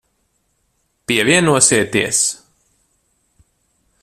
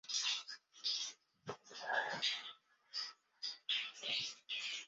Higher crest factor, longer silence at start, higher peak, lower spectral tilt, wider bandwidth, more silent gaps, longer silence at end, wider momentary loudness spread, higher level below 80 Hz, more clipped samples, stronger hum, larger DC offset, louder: about the same, 20 dB vs 20 dB; first, 1.1 s vs 0.05 s; first, 0 dBFS vs -24 dBFS; first, -2.5 dB/octave vs 2.5 dB/octave; first, 15 kHz vs 7.6 kHz; neither; first, 1.7 s vs 0 s; about the same, 13 LU vs 14 LU; first, -54 dBFS vs under -90 dBFS; neither; neither; neither; first, -14 LUFS vs -41 LUFS